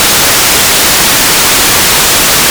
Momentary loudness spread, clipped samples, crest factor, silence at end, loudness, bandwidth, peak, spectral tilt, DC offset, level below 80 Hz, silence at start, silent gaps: 0 LU; 9%; 6 dB; 0 s; -4 LUFS; over 20 kHz; 0 dBFS; -0.5 dB/octave; under 0.1%; -28 dBFS; 0 s; none